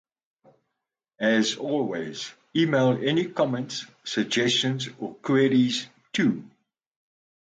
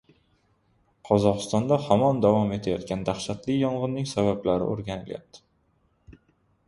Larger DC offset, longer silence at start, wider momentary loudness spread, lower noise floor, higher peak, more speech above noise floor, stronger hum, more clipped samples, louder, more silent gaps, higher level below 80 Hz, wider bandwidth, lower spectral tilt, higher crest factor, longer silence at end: neither; first, 1.2 s vs 1.05 s; about the same, 12 LU vs 11 LU; first, -84 dBFS vs -67 dBFS; second, -10 dBFS vs -4 dBFS; first, 60 dB vs 43 dB; neither; neither; about the same, -25 LUFS vs -25 LUFS; neither; second, -70 dBFS vs -54 dBFS; second, 9.2 kHz vs 11.5 kHz; second, -5 dB/octave vs -6.5 dB/octave; second, 16 dB vs 22 dB; first, 1 s vs 0.55 s